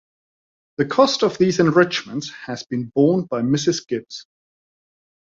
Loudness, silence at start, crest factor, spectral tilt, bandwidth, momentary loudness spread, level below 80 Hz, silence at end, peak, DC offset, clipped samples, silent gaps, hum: -19 LUFS; 0.8 s; 20 dB; -5.5 dB/octave; 7.8 kHz; 14 LU; -60 dBFS; 1.15 s; -2 dBFS; under 0.1%; under 0.1%; none; none